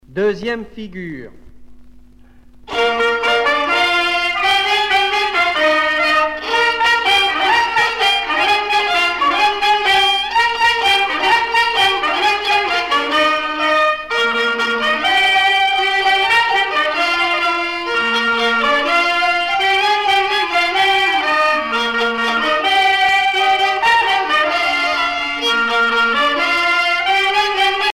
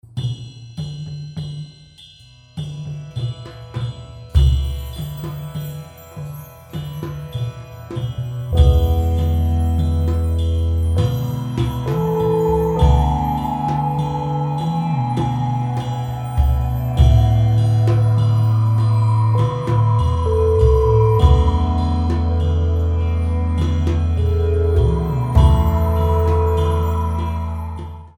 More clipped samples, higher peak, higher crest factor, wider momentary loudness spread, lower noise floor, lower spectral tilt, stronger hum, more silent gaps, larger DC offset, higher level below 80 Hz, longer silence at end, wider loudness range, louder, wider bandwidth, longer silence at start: neither; about the same, -2 dBFS vs 0 dBFS; about the same, 12 dB vs 16 dB; second, 4 LU vs 15 LU; about the same, -43 dBFS vs -45 dBFS; second, -1.5 dB/octave vs -8.5 dB/octave; neither; neither; neither; second, -48 dBFS vs -22 dBFS; about the same, 0.05 s vs 0.1 s; second, 2 LU vs 11 LU; first, -14 LUFS vs -18 LUFS; about the same, 16.5 kHz vs 16.5 kHz; about the same, 0.1 s vs 0.15 s